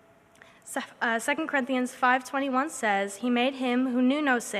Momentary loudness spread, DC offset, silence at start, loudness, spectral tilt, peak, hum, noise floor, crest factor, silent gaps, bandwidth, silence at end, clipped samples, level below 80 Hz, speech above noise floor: 5 LU; under 0.1%; 0.65 s; -27 LUFS; -3 dB/octave; -10 dBFS; none; -56 dBFS; 18 dB; none; 14.5 kHz; 0 s; under 0.1%; -78 dBFS; 29 dB